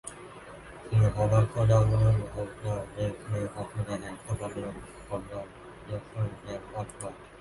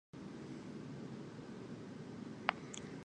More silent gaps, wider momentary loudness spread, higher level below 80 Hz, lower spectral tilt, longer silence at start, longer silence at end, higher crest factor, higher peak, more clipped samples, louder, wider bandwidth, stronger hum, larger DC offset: neither; first, 20 LU vs 10 LU; first, -46 dBFS vs -74 dBFS; first, -7.5 dB/octave vs -5 dB/octave; about the same, 0.05 s vs 0.15 s; about the same, 0 s vs 0 s; second, 18 dB vs 36 dB; about the same, -12 dBFS vs -10 dBFS; neither; first, -30 LUFS vs -47 LUFS; about the same, 11.5 kHz vs 10.5 kHz; neither; neither